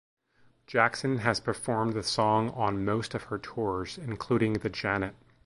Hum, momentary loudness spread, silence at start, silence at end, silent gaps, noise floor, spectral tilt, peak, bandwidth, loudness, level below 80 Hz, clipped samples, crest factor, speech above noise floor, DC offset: none; 9 LU; 0.7 s; 0.3 s; none; -64 dBFS; -5.5 dB/octave; -8 dBFS; 11.5 kHz; -29 LUFS; -56 dBFS; under 0.1%; 22 dB; 35 dB; under 0.1%